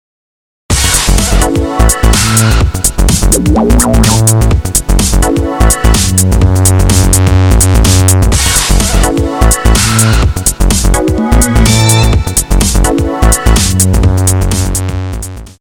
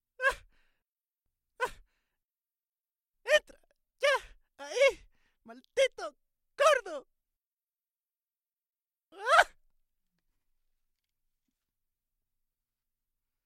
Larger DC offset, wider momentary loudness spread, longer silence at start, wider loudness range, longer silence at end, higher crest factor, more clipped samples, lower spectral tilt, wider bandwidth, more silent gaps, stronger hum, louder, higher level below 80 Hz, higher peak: neither; second, 4 LU vs 19 LU; first, 0.7 s vs 0.2 s; second, 2 LU vs 5 LU; second, 0.1 s vs 4 s; second, 8 dB vs 30 dB; first, 0.9% vs under 0.1%; first, -4 dB/octave vs 0 dB/octave; first, over 20 kHz vs 15.5 kHz; second, none vs 7.47-7.57 s; neither; first, -9 LUFS vs -29 LUFS; first, -12 dBFS vs -66 dBFS; first, 0 dBFS vs -4 dBFS